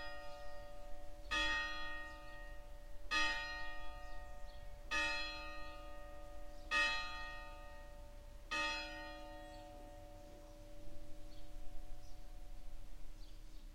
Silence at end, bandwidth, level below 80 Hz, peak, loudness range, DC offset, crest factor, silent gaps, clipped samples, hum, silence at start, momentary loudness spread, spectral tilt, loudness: 0 s; 15.5 kHz; -52 dBFS; -24 dBFS; 17 LU; under 0.1%; 18 dB; none; under 0.1%; none; 0 s; 22 LU; -2 dB/octave; -41 LUFS